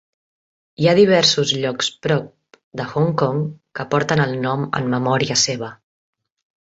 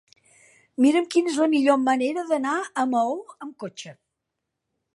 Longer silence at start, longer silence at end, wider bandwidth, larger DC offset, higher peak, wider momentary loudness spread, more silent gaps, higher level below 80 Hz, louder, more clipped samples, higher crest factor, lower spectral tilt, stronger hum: about the same, 0.8 s vs 0.8 s; second, 0.9 s vs 1.05 s; second, 8 kHz vs 11.5 kHz; neither; first, -2 dBFS vs -6 dBFS; second, 14 LU vs 18 LU; first, 2.64-2.71 s vs none; first, -56 dBFS vs -78 dBFS; first, -18 LUFS vs -22 LUFS; neither; about the same, 18 dB vs 18 dB; about the same, -4.5 dB/octave vs -4 dB/octave; neither